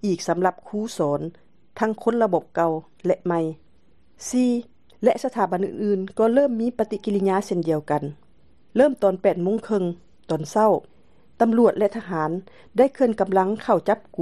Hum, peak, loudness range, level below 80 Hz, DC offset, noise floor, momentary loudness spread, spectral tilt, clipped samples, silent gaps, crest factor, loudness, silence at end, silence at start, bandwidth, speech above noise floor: none; -4 dBFS; 3 LU; -62 dBFS; 0.3%; -61 dBFS; 9 LU; -6.5 dB/octave; under 0.1%; none; 18 dB; -23 LUFS; 0 s; 0.05 s; 12.5 kHz; 39 dB